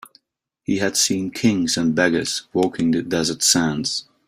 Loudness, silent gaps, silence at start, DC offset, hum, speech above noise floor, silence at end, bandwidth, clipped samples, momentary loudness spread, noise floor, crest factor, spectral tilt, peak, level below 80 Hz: -19 LUFS; none; 0.7 s; under 0.1%; none; 52 dB; 0.25 s; 16 kHz; under 0.1%; 7 LU; -72 dBFS; 20 dB; -3 dB/octave; -2 dBFS; -56 dBFS